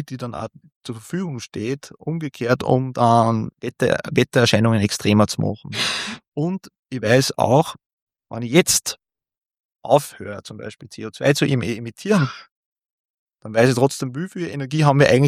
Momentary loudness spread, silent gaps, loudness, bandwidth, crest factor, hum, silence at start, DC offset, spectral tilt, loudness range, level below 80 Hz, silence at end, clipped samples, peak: 17 LU; 0.76-0.81 s, 6.28-6.32 s, 6.79-6.83 s, 7.86-8.07 s, 9.60-9.69 s, 12.51-12.76 s, 12.90-13.27 s; -20 LUFS; 16 kHz; 20 dB; none; 0 s; under 0.1%; -5 dB/octave; 5 LU; -56 dBFS; 0 s; under 0.1%; -2 dBFS